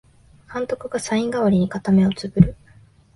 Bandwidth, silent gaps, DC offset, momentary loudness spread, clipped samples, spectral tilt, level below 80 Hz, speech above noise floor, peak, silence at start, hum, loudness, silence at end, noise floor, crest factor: 11.5 kHz; none; under 0.1%; 9 LU; under 0.1%; -7 dB/octave; -42 dBFS; 32 dB; 0 dBFS; 0.5 s; none; -20 LUFS; 0.6 s; -51 dBFS; 20 dB